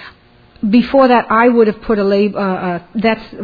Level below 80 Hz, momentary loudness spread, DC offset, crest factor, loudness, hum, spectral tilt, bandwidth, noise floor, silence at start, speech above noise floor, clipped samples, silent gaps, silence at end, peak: -44 dBFS; 8 LU; under 0.1%; 14 dB; -13 LUFS; none; -9 dB/octave; 5 kHz; -46 dBFS; 0 s; 33 dB; under 0.1%; none; 0 s; 0 dBFS